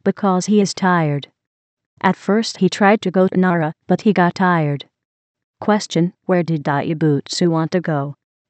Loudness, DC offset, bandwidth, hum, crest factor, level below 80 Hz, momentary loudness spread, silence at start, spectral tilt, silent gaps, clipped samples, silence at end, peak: -17 LUFS; under 0.1%; 8.8 kHz; none; 16 dB; -70 dBFS; 7 LU; 0.05 s; -6 dB/octave; 1.47-1.77 s, 1.86-1.97 s, 5.05-5.35 s, 5.44-5.54 s; under 0.1%; 0.35 s; 0 dBFS